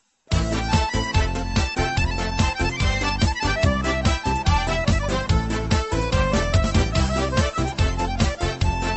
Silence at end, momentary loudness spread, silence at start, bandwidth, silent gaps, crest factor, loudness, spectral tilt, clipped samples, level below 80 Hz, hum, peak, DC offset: 0 s; 3 LU; 0.3 s; 8.4 kHz; none; 14 dB; -22 LUFS; -5 dB/octave; under 0.1%; -26 dBFS; none; -6 dBFS; under 0.1%